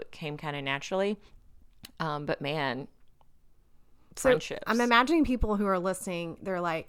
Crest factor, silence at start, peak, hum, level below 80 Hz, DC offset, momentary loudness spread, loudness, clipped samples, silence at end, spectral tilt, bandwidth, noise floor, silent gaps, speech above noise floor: 22 dB; 0 s; -8 dBFS; none; -46 dBFS; under 0.1%; 14 LU; -29 LUFS; under 0.1%; 0.05 s; -5 dB/octave; 17 kHz; -57 dBFS; none; 28 dB